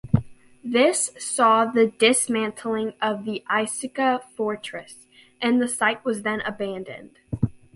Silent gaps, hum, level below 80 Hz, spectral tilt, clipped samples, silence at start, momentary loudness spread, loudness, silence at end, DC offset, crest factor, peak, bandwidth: none; none; -50 dBFS; -4 dB/octave; under 0.1%; 0.05 s; 14 LU; -23 LUFS; 0.2 s; under 0.1%; 20 dB; -4 dBFS; 12 kHz